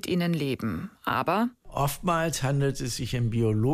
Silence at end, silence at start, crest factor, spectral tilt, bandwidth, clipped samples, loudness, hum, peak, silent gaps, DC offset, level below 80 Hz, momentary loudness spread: 0 s; 0.05 s; 16 dB; -5.5 dB/octave; 15.5 kHz; under 0.1%; -28 LUFS; none; -12 dBFS; none; under 0.1%; -46 dBFS; 6 LU